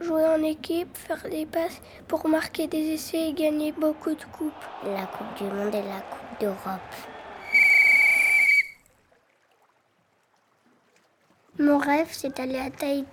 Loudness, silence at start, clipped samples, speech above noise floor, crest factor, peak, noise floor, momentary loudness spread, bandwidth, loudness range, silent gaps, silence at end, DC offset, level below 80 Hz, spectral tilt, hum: -23 LUFS; 0 s; under 0.1%; 39 dB; 18 dB; -8 dBFS; -67 dBFS; 19 LU; over 20 kHz; 11 LU; none; 0 s; under 0.1%; -62 dBFS; -4 dB/octave; none